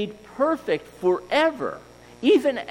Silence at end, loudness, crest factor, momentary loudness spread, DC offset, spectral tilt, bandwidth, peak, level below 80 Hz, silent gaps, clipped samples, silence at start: 0 s; -23 LUFS; 16 dB; 12 LU; under 0.1%; -5 dB/octave; 14.5 kHz; -8 dBFS; -60 dBFS; none; under 0.1%; 0 s